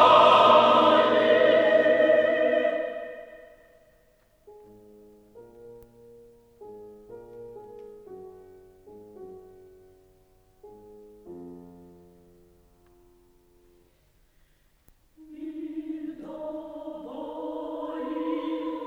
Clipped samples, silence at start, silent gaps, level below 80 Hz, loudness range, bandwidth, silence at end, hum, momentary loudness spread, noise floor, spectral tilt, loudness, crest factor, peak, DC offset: under 0.1%; 0 s; none; -64 dBFS; 28 LU; 8.4 kHz; 0 s; none; 29 LU; -63 dBFS; -5 dB/octave; -22 LUFS; 22 dB; -6 dBFS; under 0.1%